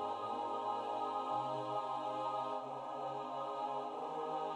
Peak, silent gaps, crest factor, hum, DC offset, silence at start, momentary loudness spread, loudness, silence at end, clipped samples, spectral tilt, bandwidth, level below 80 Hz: -26 dBFS; none; 14 dB; none; under 0.1%; 0 s; 4 LU; -40 LUFS; 0 s; under 0.1%; -5.5 dB/octave; 10.5 kHz; -88 dBFS